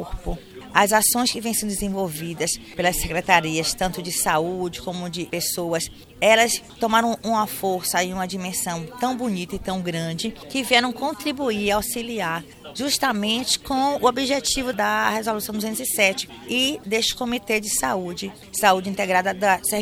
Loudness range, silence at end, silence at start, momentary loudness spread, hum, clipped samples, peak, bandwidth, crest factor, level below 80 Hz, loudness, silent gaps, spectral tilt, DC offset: 2 LU; 0 s; 0 s; 10 LU; none; under 0.1%; 0 dBFS; 18 kHz; 22 dB; -44 dBFS; -22 LUFS; none; -2.5 dB/octave; under 0.1%